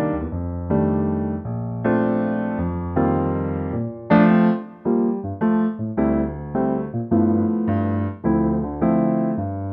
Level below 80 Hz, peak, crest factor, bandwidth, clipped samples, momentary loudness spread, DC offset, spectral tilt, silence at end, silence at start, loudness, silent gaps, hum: -40 dBFS; -4 dBFS; 16 dB; 4.2 kHz; under 0.1%; 7 LU; under 0.1%; -12 dB/octave; 0 s; 0 s; -21 LUFS; none; none